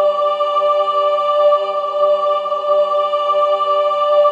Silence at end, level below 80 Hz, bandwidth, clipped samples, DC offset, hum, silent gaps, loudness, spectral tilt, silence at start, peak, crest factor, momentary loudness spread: 0 s; -86 dBFS; 7.6 kHz; under 0.1%; under 0.1%; none; none; -15 LUFS; -2.5 dB/octave; 0 s; -4 dBFS; 12 dB; 3 LU